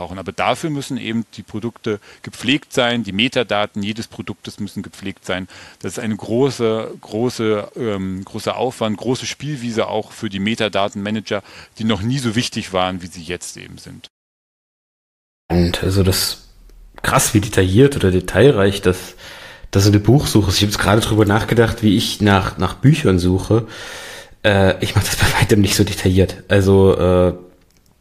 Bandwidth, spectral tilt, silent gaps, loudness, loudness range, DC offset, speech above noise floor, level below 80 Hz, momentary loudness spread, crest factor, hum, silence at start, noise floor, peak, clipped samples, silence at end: 15.5 kHz; -5 dB/octave; 14.10-15.49 s; -17 LUFS; 8 LU; under 0.1%; 35 dB; -38 dBFS; 16 LU; 18 dB; none; 0 s; -52 dBFS; 0 dBFS; under 0.1%; 0.55 s